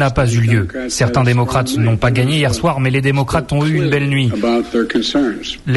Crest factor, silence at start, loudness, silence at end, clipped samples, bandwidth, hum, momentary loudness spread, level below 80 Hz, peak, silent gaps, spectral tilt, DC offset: 14 dB; 0 s; -15 LUFS; 0 s; under 0.1%; 12 kHz; none; 3 LU; -34 dBFS; -2 dBFS; none; -6 dB/octave; under 0.1%